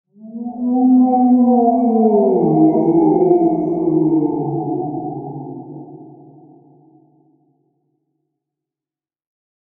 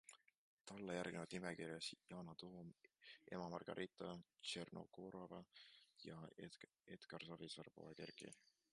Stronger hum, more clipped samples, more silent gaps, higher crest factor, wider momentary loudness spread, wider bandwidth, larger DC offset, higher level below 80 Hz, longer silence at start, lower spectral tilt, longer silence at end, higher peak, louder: neither; neither; second, none vs 0.37-0.58 s; second, 16 dB vs 22 dB; first, 18 LU vs 14 LU; second, 2.3 kHz vs 11.5 kHz; neither; first, -62 dBFS vs -84 dBFS; first, 0.25 s vs 0.05 s; first, -15 dB/octave vs -4.5 dB/octave; first, 3.7 s vs 0.35 s; first, 0 dBFS vs -32 dBFS; first, -15 LUFS vs -54 LUFS